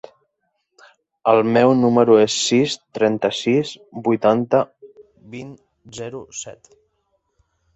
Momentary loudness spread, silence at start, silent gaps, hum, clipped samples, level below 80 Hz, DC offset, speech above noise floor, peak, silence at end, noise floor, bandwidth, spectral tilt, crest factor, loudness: 21 LU; 1.25 s; none; none; under 0.1%; -62 dBFS; under 0.1%; 54 dB; -2 dBFS; 1.25 s; -72 dBFS; 8.2 kHz; -5 dB/octave; 18 dB; -17 LUFS